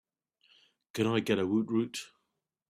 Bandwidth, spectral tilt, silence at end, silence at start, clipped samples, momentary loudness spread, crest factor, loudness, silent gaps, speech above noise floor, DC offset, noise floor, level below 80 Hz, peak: 14.5 kHz; -5.5 dB/octave; 0.65 s; 0.95 s; under 0.1%; 14 LU; 18 dB; -31 LUFS; none; 53 dB; under 0.1%; -83 dBFS; -72 dBFS; -14 dBFS